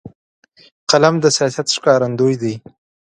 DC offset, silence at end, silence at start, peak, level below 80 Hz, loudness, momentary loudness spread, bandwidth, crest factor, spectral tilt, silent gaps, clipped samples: under 0.1%; 0.5 s; 0.05 s; 0 dBFS; -60 dBFS; -15 LUFS; 12 LU; 11.5 kHz; 16 dB; -4 dB/octave; 0.15-0.43 s, 0.72-0.87 s; under 0.1%